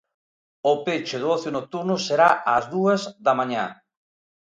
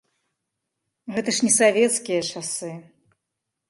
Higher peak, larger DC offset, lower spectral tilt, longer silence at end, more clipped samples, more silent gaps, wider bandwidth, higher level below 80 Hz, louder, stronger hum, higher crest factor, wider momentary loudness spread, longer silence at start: about the same, -4 dBFS vs -6 dBFS; neither; first, -5 dB/octave vs -2.5 dB/octave; second, 0.65 s vs 0.85 s; neither; neither; second, 9.4 kHz vs 11.5 kHz; about the same, -68 dBFS vs -72 dBFS; about the same, -22 LUFS vs -21 LUFS; neither; about the same, 20 dB vs 20 dB; second, 9 LU vs 19 LU; second, 0.65 s vs 1.05 s